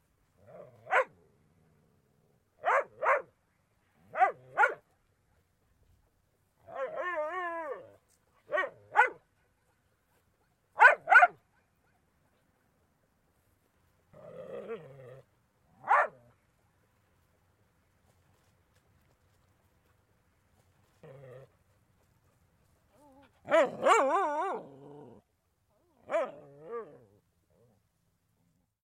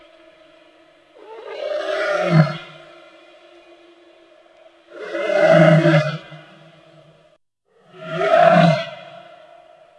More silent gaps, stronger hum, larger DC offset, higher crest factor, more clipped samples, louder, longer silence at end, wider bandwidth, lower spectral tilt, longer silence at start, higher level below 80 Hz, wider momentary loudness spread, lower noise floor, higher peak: neither; neither; neither; first, 26 dB vs 20 dB; neither; second, -28 LUFS vs -16 LUFS; first, 2 s vs 0.8 s; first, 13.5 kHz vs 9.2 kHz; second, -3 dB/octave vs -7.5 dB/octave; second, 0.55 s vs 1.3 s; second, -78 dBFS vs -68 dBFS; about the same, 25 LU vs 25 LU; first, -75 dBFS vs -60 dBFS; second, -8 dBFS vs 0 dBFS